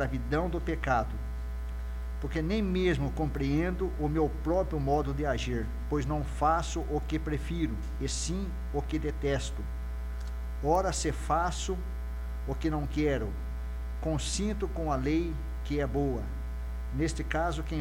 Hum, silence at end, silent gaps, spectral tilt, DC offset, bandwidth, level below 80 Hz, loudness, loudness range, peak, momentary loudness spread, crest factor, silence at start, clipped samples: none; 0 s; none; -6 dB/octave; under 0.1%; 15.5 kHz; -36 dBFS; -32 LUFS; 3 LU; -14 dBFS; 9 LU; 16 dB; 0 s; under 0.1%